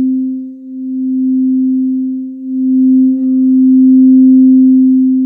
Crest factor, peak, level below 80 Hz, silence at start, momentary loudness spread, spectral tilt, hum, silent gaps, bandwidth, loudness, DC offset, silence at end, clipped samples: 8 dB; -2 dBFS; -76 dBFS; 0 s; 14 LU; -13.5 dB/octave; none; none; 0.5 kHz; -9 LUFS; under 0.1%; 0 s; under 0.1%